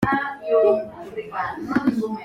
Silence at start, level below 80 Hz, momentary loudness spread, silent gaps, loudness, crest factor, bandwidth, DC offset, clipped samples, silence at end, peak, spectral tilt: 0 s; -52 dBFS; 13 LU; none; -22 LUFS; 16 dB; 14.5 kHz; under 0.1%; under 0.1%; 0 s; -6 dBFS; -7.5 dB/octave